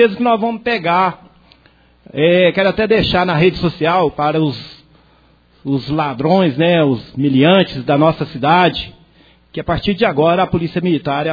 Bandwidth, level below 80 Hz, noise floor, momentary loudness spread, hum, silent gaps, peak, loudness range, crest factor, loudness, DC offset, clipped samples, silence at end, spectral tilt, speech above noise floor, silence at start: 5 kHz; -42 dBFS; -51 dBFS; 9 LU; none; none; 0 dBFS; 3 LU; 16 dB; -15 LUFS; under 0.1%; under 0.1%; 0 s; -8.5 dB/octave; 37 dB; 0 s